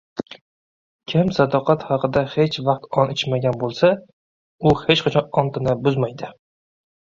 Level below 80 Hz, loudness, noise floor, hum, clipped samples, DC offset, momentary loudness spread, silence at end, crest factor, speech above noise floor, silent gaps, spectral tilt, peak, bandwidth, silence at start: -50 dBFS; -20 LUFS; under -90 dBFS; none; under 0.1%; under 0.1%; 13 LU; 0.75 s; 20 dB; over 71 dB; 0.41-0.99 s, 4.13-4.59 s; -7 dB/octave; -2 dBFS; 7.6 kHz; 0.15 s